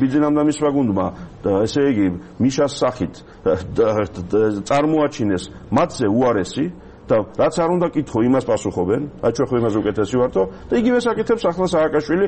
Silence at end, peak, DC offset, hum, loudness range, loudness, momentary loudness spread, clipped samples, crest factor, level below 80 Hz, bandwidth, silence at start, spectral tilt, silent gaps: 0 s; -4 dBFS; under 0.1%; none; 1 LU; -19 LUFS; 5 LU; under 0.1%; 14 dB; -44 dBFS; 8.8 kHz; 0 s; -6.5 dB/octave; none